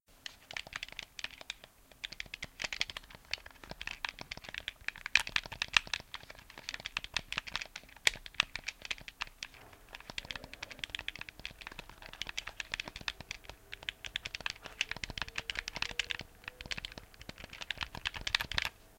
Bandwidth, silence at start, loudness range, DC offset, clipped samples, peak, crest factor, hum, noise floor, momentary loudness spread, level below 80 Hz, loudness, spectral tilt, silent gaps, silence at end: 17 kHz; 0.1 s; 7 LU; under 0.1%; under 0.1%; -4 dBFS; 38 dB; none; -59 dBFS; 15 LU; -56 dBFS; -38 LUFS; -0.5 dB/octave; none; 0 s